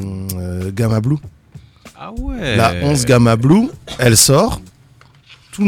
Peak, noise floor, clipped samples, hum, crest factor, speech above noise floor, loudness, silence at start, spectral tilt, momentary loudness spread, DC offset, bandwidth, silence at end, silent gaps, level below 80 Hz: 0 dBFS; -47 dBFS; under 0.1%; none; 16 dB; 34 dB; -14 LUFS; 0 s; -4.5 dB/octave; 18 LU; under 0.1%; 19 kHz; 0 s; none; -34 dBFS